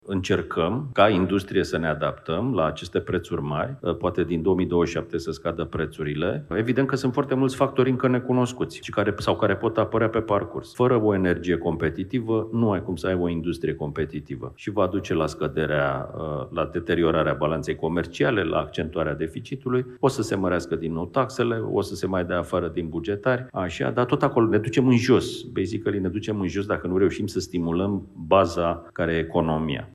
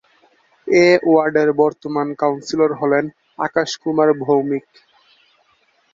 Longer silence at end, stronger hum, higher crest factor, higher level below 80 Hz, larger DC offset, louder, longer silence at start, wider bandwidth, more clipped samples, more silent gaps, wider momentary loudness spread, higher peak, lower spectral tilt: second, 0.05 s vs 1.35 s; neither; about the same, 20 dB vs 16 dB; first, -50 dBFS vs -62 dBFS; neither; second, -24 LUFS vs -17 LUFS; second, 0.05 s vs 0.65 s; first, 13 kHz vs 7.6 kHz; neither; neither; second, 8 LU vs 11 LU; about the same, -4 dBFS vs -2 dBFS; about the same, -6.5 dB/octave vs -5.5 dB/octave